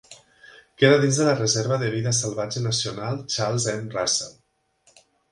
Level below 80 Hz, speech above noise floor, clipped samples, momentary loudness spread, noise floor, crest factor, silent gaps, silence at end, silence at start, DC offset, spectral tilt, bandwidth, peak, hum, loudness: -60 dBFS; 42 dB; under 0.1%; 9 LU; -64 dBFS; 22 dB; none; 1 s; 0.1 s; under 0.1%; -4 dB/octave; 11.5 kHz; -2 dBFS; none; -22 LUFS